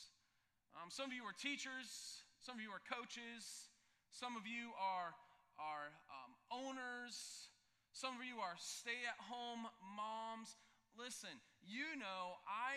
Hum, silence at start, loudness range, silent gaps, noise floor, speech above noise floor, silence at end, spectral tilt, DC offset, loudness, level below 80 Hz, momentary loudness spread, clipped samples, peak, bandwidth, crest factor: none; 0 s; 2 LU; none; -84 dBFS; 34 dB; 0 s; -1.5 dB/octave; under 0.1%; -50 LUFS; under -90 dBFS; 14 LU; under 0.1%; -28 dBFS; 15 kHz; 24 dB